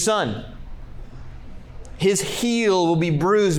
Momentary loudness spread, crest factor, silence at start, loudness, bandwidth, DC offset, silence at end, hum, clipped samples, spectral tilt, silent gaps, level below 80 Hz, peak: 24 LU; 14 dB; 0 s; -20 LUFS; over 20 kHz; under 0.1%; 0 s; none; under 0.1%; -4.5 dB/octave; none; -40 dBFS; -8 dBFS